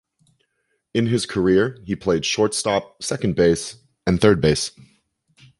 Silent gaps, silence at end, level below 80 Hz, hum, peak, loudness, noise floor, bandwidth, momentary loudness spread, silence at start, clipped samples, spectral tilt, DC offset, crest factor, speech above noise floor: none; 0.9 s; -44 dBFS; none; -2 dBFS; -20 LUFS; -72 dBFS; 11.5 kHz; 10 LU; 0.95 s; under 0.1%; -5 dB/octave; under 0.1%; 20 dB; 52 dB